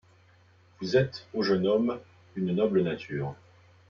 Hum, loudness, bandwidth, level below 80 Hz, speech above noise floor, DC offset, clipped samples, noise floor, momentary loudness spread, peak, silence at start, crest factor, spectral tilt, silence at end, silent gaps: none; -28 LUFS; 7 kHz; -64 dBFS; 32 dB; under 0.1%; under 0.1%; -60 dBFS; 13 LU; -12 dBFS; 0.8 s; 18 dB; -7.5 dB/octave; 0.55 s; none